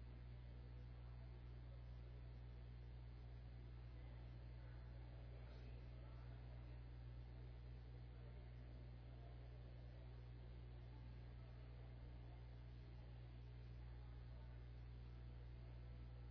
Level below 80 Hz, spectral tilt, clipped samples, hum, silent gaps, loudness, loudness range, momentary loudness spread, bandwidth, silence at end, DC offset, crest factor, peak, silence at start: -58 dBFS; -7 dB/octave; under 0.1%; 60 Hz at -55 dBFS; none; -59 LUFS; 1 LU; 1 LU; 5.4 kHz; 0 s; under 0.1%; 10 dB; -46 dBFS; 0 s